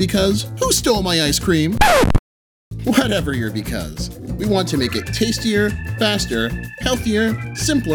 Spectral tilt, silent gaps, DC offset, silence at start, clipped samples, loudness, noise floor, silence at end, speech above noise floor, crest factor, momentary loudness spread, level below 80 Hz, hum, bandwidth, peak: -4 dB/octave; 2.19-2.71 s; under 0.1%; 0 s; under 0.1%; -18 LUFS; under -90 dBFS; 0 s; over 72 dB; 18 dB; 9 LU; -30 dBFS; none; over 20 kHz; 0 dBFS